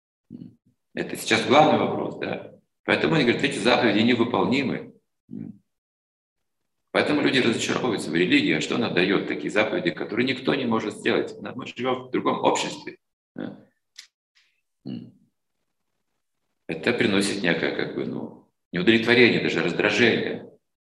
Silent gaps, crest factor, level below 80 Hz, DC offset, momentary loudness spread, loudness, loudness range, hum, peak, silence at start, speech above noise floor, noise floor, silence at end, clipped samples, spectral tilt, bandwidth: 2.79-2.84 s, 5.20-5.28 s, 5.78-6.36 s, 13.13-13.35 s, 14.14-14.35 s, 18.65-18.71 s; 22 dB; -66 dBFS; under 0.1%; 19 LU; -22 LUFS; 8 LU; none; -2 dBFS; 0.3 s; 59 dB; -82 dBFS; 0.5 s; under 0.1%; -4.5 dB/octave; 12.5 kHz